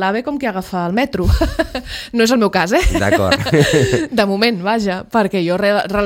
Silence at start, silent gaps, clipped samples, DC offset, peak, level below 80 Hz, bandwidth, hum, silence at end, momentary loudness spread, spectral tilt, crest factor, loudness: 0 s; none; under 0.1%; under 0.1%; 0 dBFS; -26 dBFS; 17 kHz; none; 0 s; 8 LU; -5.5 dB/octave; 16 dB; -16 LUFS